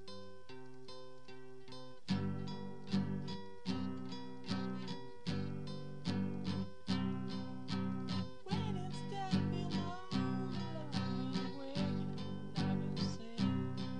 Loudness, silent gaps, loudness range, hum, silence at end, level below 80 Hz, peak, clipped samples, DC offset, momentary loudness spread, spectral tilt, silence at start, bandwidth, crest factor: -41 LUFS; none; 4 LU; none; 0 s; -66 dBFS; -22 dBFS; under 0.1%; 0.5%; 16 LU; -7 dB/octave; 0 s; 10 kHz; 18 dB